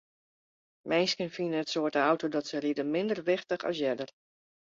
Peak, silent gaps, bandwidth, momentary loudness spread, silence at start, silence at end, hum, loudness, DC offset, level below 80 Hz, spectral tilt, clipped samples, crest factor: -12 dBFS; none; 7.6 kHz; 5 LU; 0.85 s; 0.65 s; none; -30 LUFS; under 0.1%; -76 dBFS; -4.5 dB/octave; under 0.1%; 20 dB